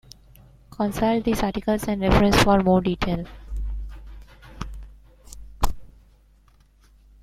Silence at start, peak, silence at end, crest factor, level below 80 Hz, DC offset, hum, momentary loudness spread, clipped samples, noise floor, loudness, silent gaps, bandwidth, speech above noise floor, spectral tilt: 0.8 s; -2 dBFS; 1.35 s; 22 dB; -34 dBFS; under 0.1%; none; 21 LU; under 0.1%; -56 dBFS; -22 LUFS; none; 15.5 kHz; 36 dB; -6 dB/octave